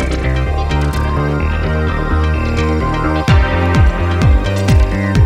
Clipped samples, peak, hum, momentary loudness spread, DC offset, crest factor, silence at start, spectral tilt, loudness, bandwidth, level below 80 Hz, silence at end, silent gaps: under 0.1%; 0 dBFS; none; 4 LU; under 0.1%; 12 dB; 0 s; -7 dB/octave; -15 LUFS; 12 kHz; -18 dBFS; 0 s; none